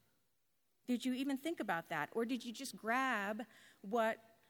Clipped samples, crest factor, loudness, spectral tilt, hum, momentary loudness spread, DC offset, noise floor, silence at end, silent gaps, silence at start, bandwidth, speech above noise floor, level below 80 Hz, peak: under 0.1%; 18 dB; -40 LUFS; -4 dB/octave; none; 10 LU; under 0.1%; -84 dBFS; 0.3 s; none; 0.9 s; 19.5 kHz; 44 dB; under -90 dBFS; -22 dBFS